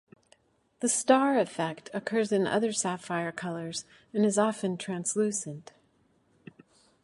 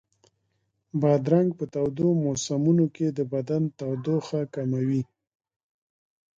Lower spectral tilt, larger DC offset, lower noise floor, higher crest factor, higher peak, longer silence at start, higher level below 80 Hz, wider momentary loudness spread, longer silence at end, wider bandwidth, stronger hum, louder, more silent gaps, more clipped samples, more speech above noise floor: second, -4 dB/octave vs -7.5 dB/octave; neither; second, -68 dBFS vs -75 dBFS; about the same, 22 dB vs 18 dB; about the same, -8 dBFS vs -8 dBFS; second, 0.8 s vs 0.95 s; second, -76 dBFS vs -64 dBFS; first, 13 LU vs 8 LU; about the same, 1.4 s vs 1.35 s; first, 11.5 kHz vs 7.8 kHz; neither; second, -29 LUFS vs -26 LUFS; neither; neither; second, 39 dB vs 50 dB